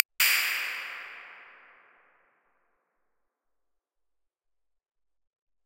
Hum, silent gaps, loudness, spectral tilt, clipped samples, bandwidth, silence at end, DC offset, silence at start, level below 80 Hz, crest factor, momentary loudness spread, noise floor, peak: none; none; -26 LUFS; 4.5 dB/octave; under 0.1%; 16 kHz; 4.15 s; under 0.1%; 0.2 s; under -90 dBFS; 36 dB; 23 LU; -81 dBFS; 0 dBFS